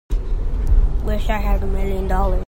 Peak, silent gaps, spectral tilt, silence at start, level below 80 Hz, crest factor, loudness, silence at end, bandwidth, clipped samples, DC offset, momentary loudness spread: -4 dBFS; none; -7.5 dB/octave; 0.1 s; -18 dBFS; 14 dB; -23 LUFS; 0.05 s; 16 kHz; under 0.1%; under 0.1%; 5 LU